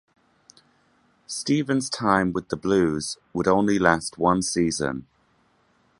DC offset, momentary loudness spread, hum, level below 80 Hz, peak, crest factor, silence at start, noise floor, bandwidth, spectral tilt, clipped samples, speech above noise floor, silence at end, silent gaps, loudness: under 0.1%; 9 LU; none; -52 dBFS; -2 dBFS; 24 dB; 1.3 s; -64 dBFS; 11.5 kHz; -4.5 dB/octave; under 0.1%; 41 dB; 1 s; none; -23 LUFS